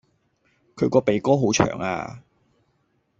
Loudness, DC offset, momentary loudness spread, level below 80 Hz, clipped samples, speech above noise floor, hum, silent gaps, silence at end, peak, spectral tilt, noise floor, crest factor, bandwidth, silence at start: -22 LUFS; under 0.1%; 10 LU; -54 dBFS; under 0.1%; 47 dB; none; none; 1 s; -2 dBFS; -5 dB/octave; -68 dBFS; 22 dB; 8 kHz; 0.75 s